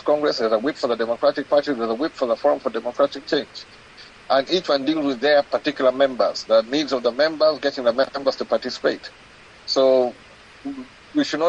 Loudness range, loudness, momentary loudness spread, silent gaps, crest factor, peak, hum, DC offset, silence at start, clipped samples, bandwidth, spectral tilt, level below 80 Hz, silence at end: 3 LU; -21 LUFS; 8 LU; none; 16 dB; -6 dBFS; none; under 0.1%; 0.05 s; under 0.1%; 8.8 kHz; -4 dB/octave; -62 dBFS; 0 s